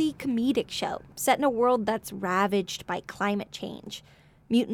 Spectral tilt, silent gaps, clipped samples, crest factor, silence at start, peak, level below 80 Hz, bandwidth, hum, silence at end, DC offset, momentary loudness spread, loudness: -4.5 dB/octave; none; under 0.1%; 20 dB; 0 s; -8 dBFS; -60 dBFS; 18.5 kHz; none; 0 s; under 0.1%; 13 LU; -28 LUFS